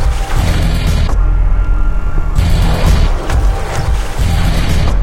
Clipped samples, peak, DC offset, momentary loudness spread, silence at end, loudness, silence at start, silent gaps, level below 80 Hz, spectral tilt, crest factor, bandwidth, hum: under 0.1%; 0 dBFS; under 0.1%; 4 LU; 0 s; -15 LUFS; 0 s; none; -12 dBFS; -5.5 dB/octave; 10 dB; 15 kHz; none